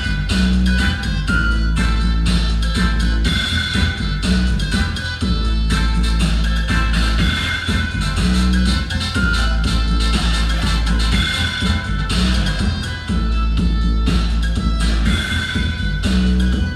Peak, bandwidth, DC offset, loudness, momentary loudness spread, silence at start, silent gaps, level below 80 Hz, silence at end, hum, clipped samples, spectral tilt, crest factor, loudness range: -4 dBFS; 12 kHz; under 0.1%; -18 LUFS; 3 LU; 0 s; none; -18 dBFS; 0 s; none; under 0.1%; -5 dB/octave; 12 dB; 1 LU